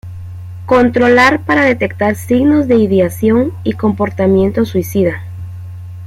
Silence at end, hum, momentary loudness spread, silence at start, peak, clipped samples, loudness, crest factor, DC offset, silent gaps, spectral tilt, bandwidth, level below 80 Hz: 0 s; none; 19 LU; 0.05 s; 0 dBFS; under 0.1%; -12 LUFS; 12 dB; under 0.1%; none; -6.5 dB/octave; 16 kHz; -44 dBFS